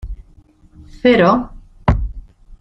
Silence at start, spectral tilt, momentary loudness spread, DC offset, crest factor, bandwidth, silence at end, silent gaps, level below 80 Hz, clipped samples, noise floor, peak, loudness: 0.05 s; -8 dB/octave; 22 LU; under 0.1%; 18 dB; 7.6 kHz; 0.05 s; none; -28 dBFS; under 0.1%; -48 dBFS; 0 dBFS; -16 LUFS